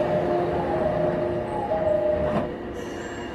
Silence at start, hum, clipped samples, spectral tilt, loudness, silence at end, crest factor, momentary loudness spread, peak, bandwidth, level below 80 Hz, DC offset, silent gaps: 0 s; none; under 0.1%; -7.5 dB/octave; -25 LUFS; 0 s; 12 dB; 10 LU; -12 dBFS; 12 kHz; -44 dBFS; under 0.1%; none